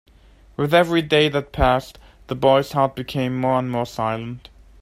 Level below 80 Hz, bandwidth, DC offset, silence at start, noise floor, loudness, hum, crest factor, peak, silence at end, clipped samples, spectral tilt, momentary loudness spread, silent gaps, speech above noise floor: -38 dBFS; 16 kHz; under 0.1%; 0.6 s; -50 dBFS; -20 LUFS; none; 18 dB; -2 dBFS; 0.45 s; under 0.1%; -6 dB/octave; 13 LU; none; 30 dB